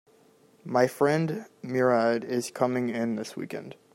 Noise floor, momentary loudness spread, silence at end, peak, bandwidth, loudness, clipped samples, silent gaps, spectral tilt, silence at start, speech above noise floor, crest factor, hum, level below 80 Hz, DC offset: -60 dBFS; 14 LU; 0.2 s; -8 dBFS; 16 kHz; -27 LUFS; under 0.1%; none; -6 dB/octave; 0.65 s; 33 dB; 20 dB; none; -74 dBFS; under 0.1%